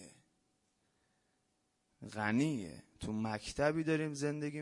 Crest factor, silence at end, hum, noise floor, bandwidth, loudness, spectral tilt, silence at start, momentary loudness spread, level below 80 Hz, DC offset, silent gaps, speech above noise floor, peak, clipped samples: 20 dB; 0 s; none; -80 dBFS; 11.5 kHz; -37 LUFS; -6 dB/octave; 0 s; 14 LU; -64 dBFS; under 0.1%; none; 44 dB; -20 dBFS; under 0.1%